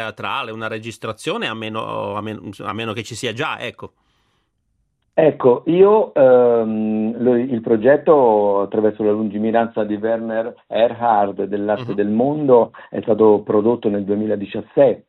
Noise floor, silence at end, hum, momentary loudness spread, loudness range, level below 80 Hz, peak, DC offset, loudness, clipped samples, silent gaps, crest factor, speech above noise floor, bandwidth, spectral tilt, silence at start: -68 dBFS; 0.1 s; none; 13 LU; 10 LU; -62 dBFS; -2 dBFS; under 0.1%; -18 LUFS; under 0.1%; none; 16 dB; 51 dB; 11.5 kHz; -6.5 dB/octave; 0 s